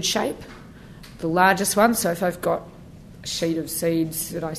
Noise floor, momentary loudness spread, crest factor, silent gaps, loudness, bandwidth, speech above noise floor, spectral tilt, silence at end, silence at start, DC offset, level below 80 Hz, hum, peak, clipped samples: -43 dBFS; 24 LU; 20 dB; none; -22 LUFS; 14 kHz; 21 dB; -3.5 dB/octave; 0 s; 0 s; under 0.1%; -50 dBFS; none; -2 dBFS; under 0.1%